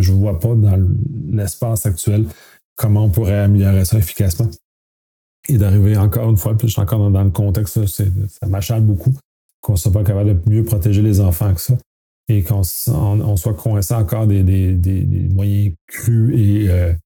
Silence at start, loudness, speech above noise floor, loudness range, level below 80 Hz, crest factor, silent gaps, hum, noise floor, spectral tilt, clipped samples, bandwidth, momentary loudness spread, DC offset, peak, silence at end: 0 s; -16 LUFS; over 76 dB; 1 LU; -32 dBFS; 12 dB; 2.64-2.76 s, 4.64-5.43 s, 9.25-9.63 s, 11.86-12.24 s, 15.81-15.88 s; none; under -90 dBFS; -7 dB/octave; under 0.1%; 19 kHz; 7 LU; under 0.1%; -4 dBFS; 0.05 s